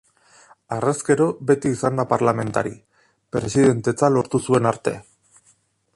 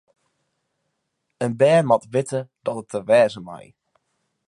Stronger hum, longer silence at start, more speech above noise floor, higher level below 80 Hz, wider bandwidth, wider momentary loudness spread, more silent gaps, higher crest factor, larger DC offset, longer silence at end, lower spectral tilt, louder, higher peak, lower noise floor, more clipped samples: neither; second, 0.7 s vs 1.4 s; second, 41 dB vs 56 dB; first, -54 dBFS vs -68 dBFS; about the same, 11.5 kHz vs 11.5 kHz; second, 10 LU vs 17 LU; neither; about the same, 18 dB vs 20 dB; neither; about the same, 0.95 s vs 0.9 s; about the same, -6.5 dB/octave vs -6 dB/octave; about the same, -21 LUFS vs -20 LUFS; about the same, -4 dBFS vs -4 dBFS; second, -61 dBFS vs -76 dBFS; neither